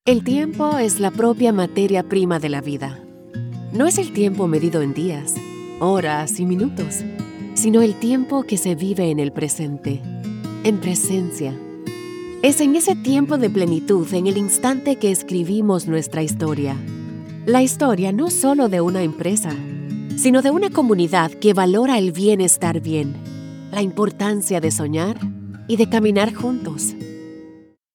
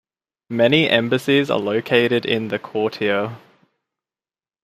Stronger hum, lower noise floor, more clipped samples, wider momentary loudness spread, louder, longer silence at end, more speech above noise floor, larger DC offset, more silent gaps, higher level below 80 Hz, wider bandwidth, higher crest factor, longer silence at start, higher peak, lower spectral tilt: neither; second, -45 dBFS vs under -90 dBFS; neither; first, 13 LU vs 8 LU; about the same, -19 LUFS vs -19 LUFS; second, 0.4 s vs 1.25 s; second, 27 dB vs over 71 dB; neither; neither; about the same, -60 dBFS vs -64 dBFS; first, 19.5 kHz vs 15 kHz; about the same, 18 dB vs 18 dB; second, 0.05 s vs 0.5 s; about the same, -2 dBFS vs -2 dBFS; about the same, -5 dB/octave vs -6 dB/octave